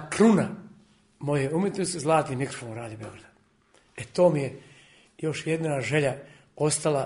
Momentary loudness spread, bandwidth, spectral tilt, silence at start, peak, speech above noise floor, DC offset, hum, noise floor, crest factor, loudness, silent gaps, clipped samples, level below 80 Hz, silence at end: 19 LU; 11 kHz; -5.5 dB/octave; 0 s; -8 dBFS; 37 dB; under 0.1%; none; -62 dBFS; 18 dB; -26 LUFS; none; under 0.1%; -62 dBFS; 0 s